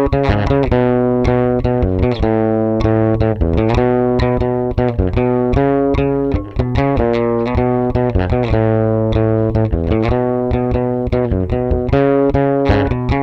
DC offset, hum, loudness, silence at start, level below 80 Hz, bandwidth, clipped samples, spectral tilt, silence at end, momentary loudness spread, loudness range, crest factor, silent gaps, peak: under 0.1%; none; -15 LUFS; 0 s; -24 dBFS; 6.4 kHz; under 0.1%; -9.5 dB/octave; 0 s; 3 LU; 1 LU; 12 dB; none; -2 dBFS